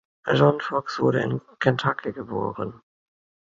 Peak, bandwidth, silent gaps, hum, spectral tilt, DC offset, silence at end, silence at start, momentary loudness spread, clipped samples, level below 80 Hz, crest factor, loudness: -4 dBFS; 7.6 kHz; none; none; -7 dB/octave; under 0.1%; 0.75 s; 0.25 s; 11 LU; under 0.1%; -58 dBFS; 22 dB; -24 LUFS